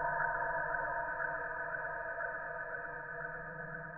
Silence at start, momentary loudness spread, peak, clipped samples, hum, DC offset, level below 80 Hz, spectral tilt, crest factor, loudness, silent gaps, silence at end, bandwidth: 0 s; 8 LU; -22 dBFS; under 0.1%; none; under 0.1%; -60 dBFS; -6.5 dB/octave; 16 dB; -38 LUFS; none; 0 s; 2.9 kHz